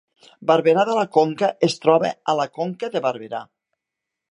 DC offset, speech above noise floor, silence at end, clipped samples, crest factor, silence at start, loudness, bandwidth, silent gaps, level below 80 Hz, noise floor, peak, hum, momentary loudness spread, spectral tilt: under 0.1%; 64 dB; 0.9 s; under 0.1%; 20 dB; 0.4 s; -20 LUFS; 10.5 kHz; none; -72 dBFS; -84 dBFS; -2 dBFS; none; 11 LU; -5.5 dB/octave